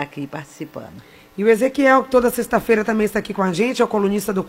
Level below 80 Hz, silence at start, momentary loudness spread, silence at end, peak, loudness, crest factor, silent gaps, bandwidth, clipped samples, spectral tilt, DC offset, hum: -50 dBFS; 0 s; 18 LU; 0 s; 0 dBFS; -18 LUFS; 18 dB; none; 16 kHz; under 0.1%; -5.5 dB/octave; under 0.1%; none